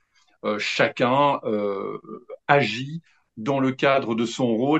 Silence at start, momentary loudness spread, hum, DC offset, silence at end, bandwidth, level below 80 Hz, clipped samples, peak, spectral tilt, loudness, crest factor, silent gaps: 0.45 s; 15 LU; none; under 0.1%; 0 s; 8.6 kHz; -70 dBFS; under 0.1%; -4 dBFS; -5.5 dB/octave; -23 LUFS; 20 dB; none